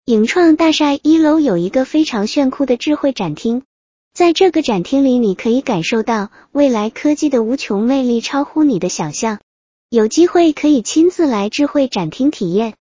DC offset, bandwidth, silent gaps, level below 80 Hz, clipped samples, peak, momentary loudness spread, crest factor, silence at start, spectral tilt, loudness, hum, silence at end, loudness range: under 0.1%; 7.6 kHz; 3.65-4.11 s, 9.43-9.89 s; -52 dBFS; under 0.1%; 0 dBFS; 7 LU; 14 dB; 0.1 s; -5 dB/octave; -15 LUFS; none; 0.1 s; 2 LU